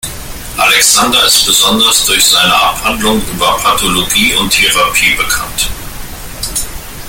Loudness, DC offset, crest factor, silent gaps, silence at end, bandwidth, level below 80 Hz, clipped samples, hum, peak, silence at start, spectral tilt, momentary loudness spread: -8 LUFS; under 0.1%; 12 dB; none; 0 s; over 20 kHz; -28 dBFS; 0.1%; none; 0 dBFS; 0.05 s; -1 dB/octave; 16 LU